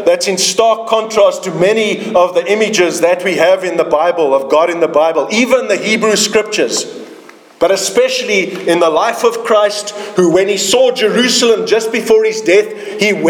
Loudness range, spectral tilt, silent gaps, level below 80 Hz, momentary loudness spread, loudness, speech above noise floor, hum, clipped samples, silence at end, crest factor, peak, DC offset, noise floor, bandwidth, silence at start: 2 LU; -3 dB/octave; none; -56 dBFS; 4 LU; -12 LUFS; 25 dB; none; under 0.1%; 0 s; 12 dB; 0 dBFS; under 0.1%; -37 dBFS; 18.5 kHz; 0 s